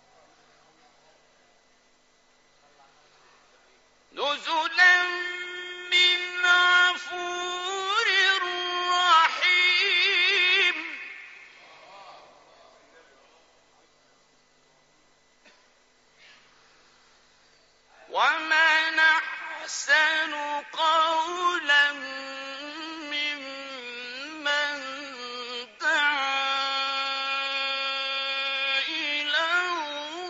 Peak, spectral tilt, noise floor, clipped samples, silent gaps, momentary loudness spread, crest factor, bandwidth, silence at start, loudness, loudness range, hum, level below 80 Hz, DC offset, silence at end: -6 dBFS; 5 dB/octave; -62 dBFS; under 0.1%; none; 16 LU; 20 dB; 8 kHz; 4.15 s; -23 LUFS; 10 LU; none; -78 dBFS; under 0.1%; 0 s